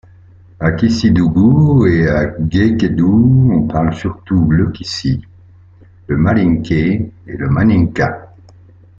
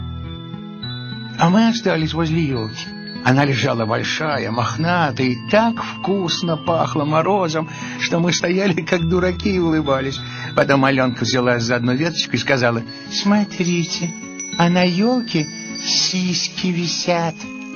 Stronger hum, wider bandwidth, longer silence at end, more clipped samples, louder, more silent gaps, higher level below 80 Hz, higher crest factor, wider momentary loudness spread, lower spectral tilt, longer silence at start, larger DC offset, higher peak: neither; about the same, 7.6 kHz vs 7 kHz; first, 0.7 s vs 0 s; neither; first, -13 LUFS vs -18 LUFS; neither; first, -34 dBFS vs -46 dBFS; second, 12 dB vs 18 dB; about the same, 10 LU vs 11 LU; first, -8 dB/octave vs -4 dB/octave; first, 0.6 s vs 0 s; neither; about the same, -2 dBFS vs 0 dBFS